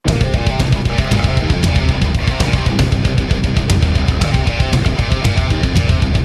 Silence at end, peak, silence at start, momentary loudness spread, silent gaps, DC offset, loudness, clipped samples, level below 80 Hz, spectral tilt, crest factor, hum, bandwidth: 0 s; -2 dBFS; 0.05 s; 2 LU; none; under 0.1%; -15 LUFS; under 0.1%; -18 dBFS; -5.5 dB/octave; 12 dB; none; 13.5 kHz